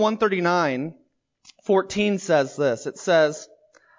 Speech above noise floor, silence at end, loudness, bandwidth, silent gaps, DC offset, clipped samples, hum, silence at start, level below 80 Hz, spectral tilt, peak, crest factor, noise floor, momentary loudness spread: 34 dB; 0.55 s; -22 LUFS; 7.6 kHz; none; under 0.1%; under 0.1%; none; 0 s; -64 dBFS; -5 dB/octave; -8 dBFS; 14 dB; -56 dBFS; 11 LU